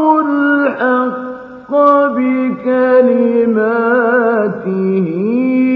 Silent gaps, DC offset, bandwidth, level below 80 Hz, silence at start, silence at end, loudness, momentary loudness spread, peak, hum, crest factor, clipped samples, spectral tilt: none; under 0.1%; 4.8 kHz; -62 dBFS; 0 s; 0 s; -13 LUFS; 7 LU; 0 dBFS; none; 12 dB; under 0.1%; -9.5 dB/octave